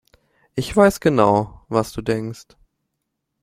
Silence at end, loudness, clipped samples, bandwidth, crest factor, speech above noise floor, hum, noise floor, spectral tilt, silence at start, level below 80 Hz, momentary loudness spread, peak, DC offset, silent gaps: 1 s; -19 LUFS; under 0.1%; 16 kHz; 20 dB; 59 dB; none; -77 dBFS; -6 dB/octave; 0.55 s; -46 dBFS; 15 LU; -2 dBFS; under 0.1%; none